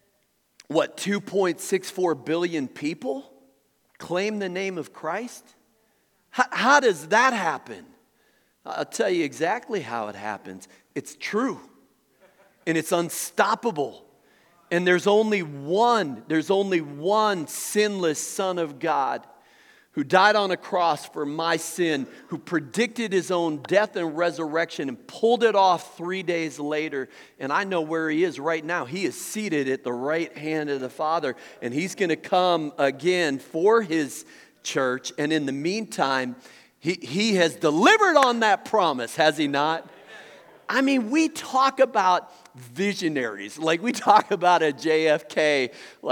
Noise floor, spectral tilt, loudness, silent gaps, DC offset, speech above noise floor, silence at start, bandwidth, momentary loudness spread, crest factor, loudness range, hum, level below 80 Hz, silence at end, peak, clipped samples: -69 dBFS; -4 dB/octave; -24 LUFS; none; under 0.1%; 45 dB; 0.7 s; 19 kHz; 13 LU; 24 dB; 7 LU; none; -84 dBFS; 0 s; -2 dBFS; under 0.1%